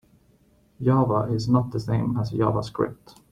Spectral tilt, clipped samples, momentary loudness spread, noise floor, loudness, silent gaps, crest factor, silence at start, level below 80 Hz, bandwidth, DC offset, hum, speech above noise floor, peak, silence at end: -8.5 dB/octave; under 0.1%; 7 LU; -60 dBFS; -24 LUFS; none; 18 dB; 0.8 s; -52 dBFS; 10.5 kHz; under 0.1%; none; 37 dB; -8 dBFS; 0.4 s